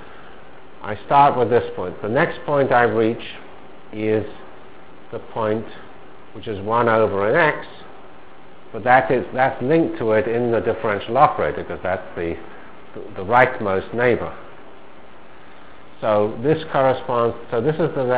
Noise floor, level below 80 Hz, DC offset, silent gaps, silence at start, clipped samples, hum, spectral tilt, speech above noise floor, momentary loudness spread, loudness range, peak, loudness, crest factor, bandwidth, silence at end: -45 dBFS; -50 dBFS; 2%; none; 0 s; under 0.1%; none; -10 dB/octave; 26 dB; 19 LU; 4 LU; 0 dBFS; -19 LUFS; 20 dB; 4 kHz; 0 s